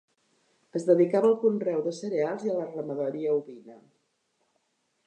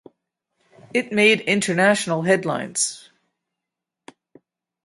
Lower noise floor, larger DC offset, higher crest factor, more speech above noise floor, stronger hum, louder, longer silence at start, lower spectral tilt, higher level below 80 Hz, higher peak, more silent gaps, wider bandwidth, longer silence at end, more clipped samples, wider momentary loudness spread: second, -74 dBFS vs -85 dBFS; neither; about the same, 18 dB vs 20 dB; second, 48 dB vs 65 dB; neither; second, -27 LUFS vs -19 LUFS; second, 0.75 s vs 0.95 s; first, -7.5 dB/octave vs -3.5 dB/octave; second, -86 dBFS vs -68 dBFS; second, -10 dBFS vs -2 dBFS; neither; second, 9.4 kHz vs 11.5 kHz; second, 1.3 s vs 1.85 s; neither; about the same, 10 LU vs 9 LU